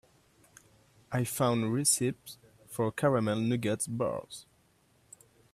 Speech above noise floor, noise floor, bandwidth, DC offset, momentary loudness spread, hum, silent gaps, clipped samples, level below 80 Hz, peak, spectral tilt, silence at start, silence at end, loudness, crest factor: 37 dB; -67 dBFS; 16 kHz; under 0.1%; 20 LU; none; none; under 0.1%; -68 dBFS; -14 dBFS; -4.5 dB/octave; 1.1 s; 1.1 s; -30 LUFS; 20 dB